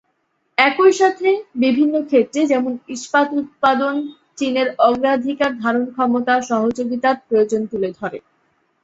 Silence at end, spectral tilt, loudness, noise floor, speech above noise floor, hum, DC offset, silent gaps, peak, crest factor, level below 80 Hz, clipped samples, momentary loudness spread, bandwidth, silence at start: 0.65 s; -4.5 dB/octave; -18 LUFS; -68 dBFS; 50 dB; none; under 0.1%; none; 0 dBFS; 18 dB; -62 dBFS; under 0.1%; 9 LU; 8 kHz; 0.6 s